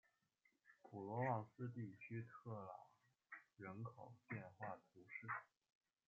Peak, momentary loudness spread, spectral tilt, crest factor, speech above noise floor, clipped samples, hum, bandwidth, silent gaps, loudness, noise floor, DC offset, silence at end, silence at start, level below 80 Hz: -30 dBFS; 16 LU; -8.5 dB/octave; 24 dB; 30 dB; under 0.1%; none; 7.2 kHz; none; -52 LUFS; -84 dBFS; under 0.1%; 0.65 s; 0.65 s; under -90 dBFS